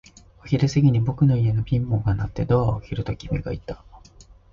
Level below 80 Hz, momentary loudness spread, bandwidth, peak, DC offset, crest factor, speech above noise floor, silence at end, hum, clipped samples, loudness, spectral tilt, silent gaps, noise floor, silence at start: -38 dBFS; 12 LU; 7.2 kHz; -6 dBFS; under 0.1%; 16 dB; 28 dB; 0.55 s; none; under 0.1%; -23 LUFS; -8 dB/octave; none; -49 dBFS; 0.45 s